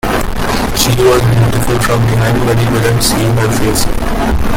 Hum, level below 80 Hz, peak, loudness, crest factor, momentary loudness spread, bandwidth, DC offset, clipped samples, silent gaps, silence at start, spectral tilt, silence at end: none; -20 dBFS; 0 dBFS; -12 LUFS; 10 dB; 6 LU; 17 kHz; under 0.1%; under 0.1%; none; 0.05 s; -5 dB/octave; 0 s